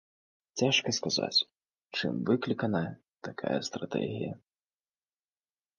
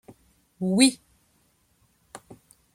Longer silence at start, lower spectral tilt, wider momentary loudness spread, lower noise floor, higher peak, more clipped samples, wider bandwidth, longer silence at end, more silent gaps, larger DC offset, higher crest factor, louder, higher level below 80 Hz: about the same, 0.55 s vs 0.6 s; about the same, -4 dB/octave vs -3.5 dB/octave; second, 13 LU vs 28 LU; first, under -90 dBFS vs -66 dBFS; second, -14 dBFS vs -4 dBFS; neither; second, 10 kHz vs 15.5 kHz; first, 1.4 s vs 0.6 s; neither; neither; second, 20 dB vs 26 dB; second, -31 LUFS vs -22 LUFS; about the same, -70 dBFS vs -68 dBFS